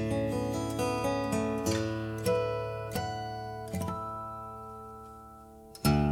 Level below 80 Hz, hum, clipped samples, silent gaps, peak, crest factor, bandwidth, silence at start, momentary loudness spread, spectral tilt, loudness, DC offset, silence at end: -48 dBFS; none; under 0.1%; none; -14 dBFS; 18 dB; 18 kHz; 0 s; 16 LU; -6 dB/octave; -33 LUFS; under 0.1%; 0 s